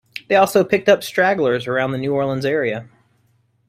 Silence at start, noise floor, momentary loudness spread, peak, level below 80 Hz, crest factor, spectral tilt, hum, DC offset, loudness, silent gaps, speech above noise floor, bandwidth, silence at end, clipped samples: 0.15 s; -61 dBFS; 6 LU; -2 dBFS; -58 dBFS; 18 dB; -5.5 dB/octave; none; under 0.1%; -18 LUFS; none; 44 dB; 16 kHz; 0.85 s; under 0.1%